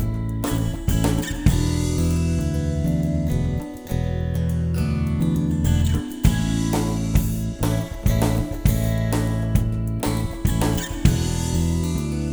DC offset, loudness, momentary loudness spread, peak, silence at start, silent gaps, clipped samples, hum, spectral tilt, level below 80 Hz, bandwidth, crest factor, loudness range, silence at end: under 0.1%; -23 LUFS; 4 LU; -2 dBFS; 0 s; none; under 0.1%; none; -6.5 dB/octave; -28 dBFS; over 20 kHz; 18 dB; 1 LU; 0 s